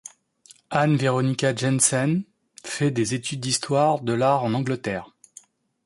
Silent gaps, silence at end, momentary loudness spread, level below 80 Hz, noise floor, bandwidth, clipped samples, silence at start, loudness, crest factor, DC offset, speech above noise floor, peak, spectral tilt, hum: none; 0.8 s; 12 LU; -62 dBFS; -54 dBFS; 11.5 kHz; under 0.1%; 0.7 s; -23 LUFS; 18 dB; under 0.1%; 32 dB; -4 dBFS; -4.5 dB/octave; none